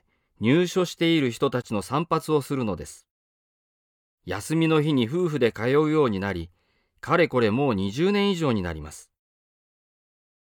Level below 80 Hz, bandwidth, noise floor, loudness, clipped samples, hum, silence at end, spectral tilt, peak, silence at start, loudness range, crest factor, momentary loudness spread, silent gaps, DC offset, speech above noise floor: -54 dBFS; 18 kHz; under -90 dBFS; -24 LUFS; under 0.1%; none; 1.55 s; -6 dB/octave; -8 dBFS; 0.4 s; 4 LU; 18 dB; 12 LU; 3.11-4.18 s; under 0.1%; over 67 dB